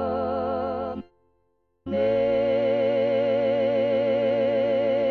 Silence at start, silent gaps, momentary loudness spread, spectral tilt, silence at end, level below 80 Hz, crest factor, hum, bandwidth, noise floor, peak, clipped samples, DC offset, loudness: 0 s; none; 8 LU; -8 dB/octave; 0 s; -54 dBFS; 12 dB; none; 4.8 kHz; -71 dBFS; -12 dBFS; under 0.1%; under 0.1%; -24 LUFS